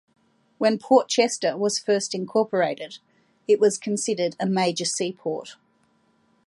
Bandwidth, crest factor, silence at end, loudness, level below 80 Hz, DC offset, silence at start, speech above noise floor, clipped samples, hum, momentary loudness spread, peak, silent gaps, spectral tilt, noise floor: 11.5 kHz; 18 dB; 0.9 s; -23 LUFS; -76 dBFS; under 0.1%; 0.6 s; 42 dB; under 0.1%; none; 14 LU; -6 dBFS; none; -3.5 dB/octave; -65 dBFS